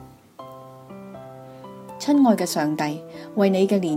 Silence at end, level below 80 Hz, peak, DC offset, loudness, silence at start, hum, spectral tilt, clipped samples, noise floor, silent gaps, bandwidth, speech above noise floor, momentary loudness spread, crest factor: 0 s; -68 dBFS; -4 dBFS; under 0.1%; -21 LUFS; 0 s; none; -6 dB/octave; under 0.1%; -43 dBFS; none; 16 kHz; 23 dB; 23 LU; 18 dB